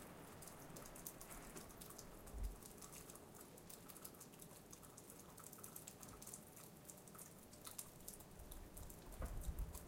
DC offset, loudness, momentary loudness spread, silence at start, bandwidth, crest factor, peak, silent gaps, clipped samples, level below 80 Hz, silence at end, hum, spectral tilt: under 0.1%; -56 LUFS; 5 LU; 0 s; 17 kHz; 24 dB; -32 dBFS; none; under 0.1%; -58 dBFS; 0 s; none; -3.5 dB/octave